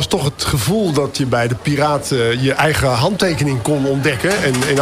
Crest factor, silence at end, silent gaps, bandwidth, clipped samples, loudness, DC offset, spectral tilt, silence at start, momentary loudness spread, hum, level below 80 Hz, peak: 12 dB; 0 s; none; 16 kHz; under 0.1%; -16 LUFS; under 0.1%; -5 dB/octave; 0 s; 3 LU; none; -40 dBFS; -4 dBFS